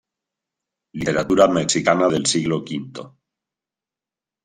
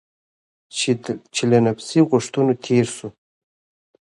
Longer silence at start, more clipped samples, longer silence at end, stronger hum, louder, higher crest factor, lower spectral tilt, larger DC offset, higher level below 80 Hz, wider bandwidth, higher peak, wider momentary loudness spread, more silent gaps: first, 0.95 s vs 0.75 s; neither; first, 1.35 s vs 0.95 s; neither; about the same, -19 LUFS vs -20 LUFS; about the same, 20 dB vs 18 dB; second, -4 dB/octave vs -5.5 dB/octave; neither; first, -54 dBFS vs -60 dBFS; first, 13.5 kHz vs 11.5 kHz; about the same, -2 dBFS vs -2 dBFS; first, 18 LU vs 11 LU; neither